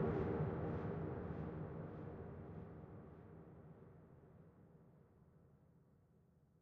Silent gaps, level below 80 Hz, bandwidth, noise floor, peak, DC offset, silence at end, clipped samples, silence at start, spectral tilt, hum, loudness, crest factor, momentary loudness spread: none; -62 dBFS; 5.2 kHz; -72 dBFS; -28 dBFS; under 0.1%; 0.8 s; under 0.1%; 0 s; -9.5 dB/octave; none; -47 LUFS; 20 dB; 24 LU